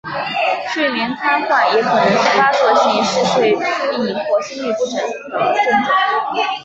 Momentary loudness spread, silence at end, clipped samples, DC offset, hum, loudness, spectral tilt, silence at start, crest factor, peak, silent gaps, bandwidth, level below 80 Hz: 7 LU; 0 s; under 0.1%; under 0.1%; none; -16 LUFS; -3.5 dB/octave; 0.05 s; 14 dB; -2 dBFS; none; 8.2 kHz; -60 dBFS